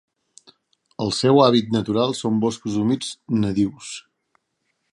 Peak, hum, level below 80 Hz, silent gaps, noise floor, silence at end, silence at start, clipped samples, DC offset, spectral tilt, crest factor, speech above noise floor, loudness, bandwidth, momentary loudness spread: 0 dBFS; none; -54 dBFS; none; -73 dBFS; 0.9 s; 1 s; under 0.1%; under 0.1%; -6 dB/octave; 22 dB; 53 dB; -20 LUFS; 11.5 kHz; 17 LU